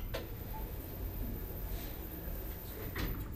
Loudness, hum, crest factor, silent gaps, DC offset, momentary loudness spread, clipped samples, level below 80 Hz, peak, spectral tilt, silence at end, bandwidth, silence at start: -43 LUFS; none; 16 dB; none; under 0.1%; 4 LU; under 0.1%; -44 dBFS; -24 dBFS; -5.5 dB/octave; 0 s; 16 kHz; 0 s